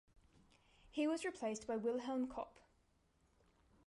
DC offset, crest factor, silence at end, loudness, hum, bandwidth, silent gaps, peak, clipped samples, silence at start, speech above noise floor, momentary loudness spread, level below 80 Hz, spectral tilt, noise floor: under 0.1%; 16 dB; 1.35 s; -42 LUFS; none; 11.5 kHz; none; -28 dBFS; under 0.1%; 0.85 s; 35 dB; 9 LU; -74 dBFS; -4.5 dB/octave; -77 dBFS